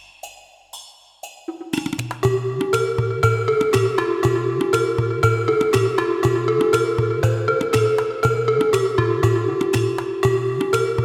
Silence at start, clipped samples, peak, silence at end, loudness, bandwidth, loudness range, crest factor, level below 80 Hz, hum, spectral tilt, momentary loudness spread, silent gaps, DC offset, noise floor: 0.25 s; under 0.1%; -2 dBFS; 0 s; -20 LUFS; 16 kHz; 3 LU; 16 dB; -46 dBFS; none; -6.5 dB/octave; 16 LU; none; under 0.1%; -43 dBFS